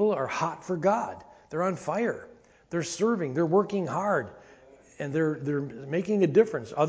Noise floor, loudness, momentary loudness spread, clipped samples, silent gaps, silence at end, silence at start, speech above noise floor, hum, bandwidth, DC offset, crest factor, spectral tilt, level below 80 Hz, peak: -54 dBFS; -28 LUFS; 11 LU; under 0.1%; none; 0 s; 0 s; 27 dB; none; 8 kHz; under 0.1%; 20 dB; -6.5 dB/octave; -66 dBFS; -8 dBFS